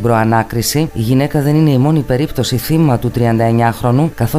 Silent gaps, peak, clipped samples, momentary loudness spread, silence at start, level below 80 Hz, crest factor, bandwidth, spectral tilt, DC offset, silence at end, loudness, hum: none; 0 dBFS; under 0.1%; 4 LU; 0 s; -34 dBFS; 12 dB; 16 kHz; -6.5 dB/octave; under 0.1%; 0 s; -13 LUFS; none